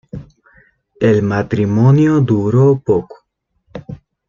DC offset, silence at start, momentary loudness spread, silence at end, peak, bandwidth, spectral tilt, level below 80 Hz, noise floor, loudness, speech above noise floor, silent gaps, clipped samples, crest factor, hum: under 0.1%; 0.15 s; 22 LU; 0.35 s; -2 dBFS; 7.2 kHz; -9.5 dB/octave; -48 dBFS; -65 dBFS; -13 LUFS; 53 dB; none; under 0.1%; 14 dB; none